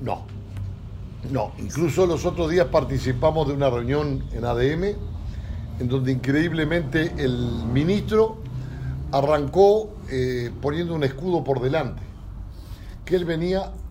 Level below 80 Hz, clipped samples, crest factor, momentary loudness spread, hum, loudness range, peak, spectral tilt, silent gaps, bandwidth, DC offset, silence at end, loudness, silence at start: -38 dBFS; under 0.1%; 20 dB; 14 LU; none; 4 LU; -4 dBFS; -7 dB/octave; none; 16 kHz; under 0.1%; 0 s; -23 LUFS; 0 s